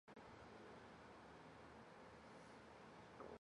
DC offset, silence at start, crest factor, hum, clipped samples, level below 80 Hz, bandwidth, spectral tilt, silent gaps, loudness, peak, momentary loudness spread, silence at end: under 0.1%; 0.05 s; 18 dB; none; under 0.1%; -78 dBFS; 11 kHz; -5.5 dB/octave; none; -62 LUFS; -44 dBFS; 2 LU; 0.05 s